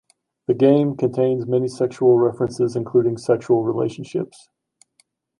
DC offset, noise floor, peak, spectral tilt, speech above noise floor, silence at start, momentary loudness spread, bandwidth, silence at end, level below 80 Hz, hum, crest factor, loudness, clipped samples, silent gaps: under 0.1%; -64 dBFS; -4 dBFS; -8 dB/octave; 45 dB; 0.5 s; 11 LU; 10.5 kHz; 1.15 s; -62 dBFS; none; 16 dB; -20 LUFS; under 0.1%; none